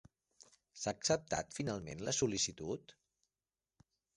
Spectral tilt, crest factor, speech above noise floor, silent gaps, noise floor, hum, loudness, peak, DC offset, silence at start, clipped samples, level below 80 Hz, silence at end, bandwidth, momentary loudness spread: -3.5 dB/octave; 22 dB; over 51 dB; none; under -90 dBFS; none; -38 LUFS; -18 dBFS; under 0.1%; 0.75 s; under 0.1%; -66 dBFS; 1.25 s; 11.5 kHz; 10 LU